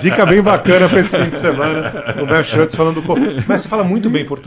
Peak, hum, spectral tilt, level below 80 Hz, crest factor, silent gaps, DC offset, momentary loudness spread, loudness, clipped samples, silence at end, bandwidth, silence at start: 0 dBFS; none; -10.5 dB/octave; -42 dBFS; 14 dB; none; under 0.1%; 7 LU; -13 LUFS; under 0.1%; 0.05 s; 4 kHz; 0 s